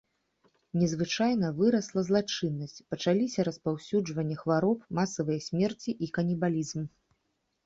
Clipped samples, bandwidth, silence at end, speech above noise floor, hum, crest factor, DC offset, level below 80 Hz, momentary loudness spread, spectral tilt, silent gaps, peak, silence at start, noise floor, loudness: under 0.1%; 7.8 kHz; 0.8 s; 49 dB; none; 16 dB; under 0.1%; -66 dBFS; 8 LU; -6 dB/octave; none; -14 dBFS; 0.75 s; -78 dBFS; -30 LUFS